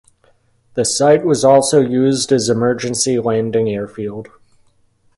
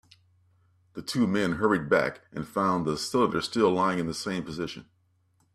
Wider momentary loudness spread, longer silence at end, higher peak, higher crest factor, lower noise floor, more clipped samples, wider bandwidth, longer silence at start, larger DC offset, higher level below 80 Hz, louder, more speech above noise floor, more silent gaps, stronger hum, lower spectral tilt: about the same, 14 LU vs 13 LU; first, 0.95 s vs 0.75 s; first, 0 dBFS vs -10 dBFS; about the same, 16 dB vs 20 dB; second, -56 dBFS vs -68 dBFS; neither; second, 11.5 kHz vs 14.5 kHz; second, 0.75 s vs 0.95 s; neither; first, -54 dBFS vs -60 dBFS; first, -15 LUFS vs -27 LUFS; about the same, 42 dB vs 41 dB; neither; neither; about the same, -4.5 dB/octave vs -5.5 dB/octave